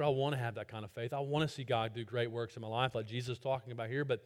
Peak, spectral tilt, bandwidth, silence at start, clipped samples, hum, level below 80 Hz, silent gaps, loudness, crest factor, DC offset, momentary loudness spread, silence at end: -16 dBFS; -6.5 dB/octave; 14 kHz; 0 s; under 0.1%; none; -70 dBFS; none; -38 LUFS; 20 dB; under 0.1%; 6 LU; 0.05 s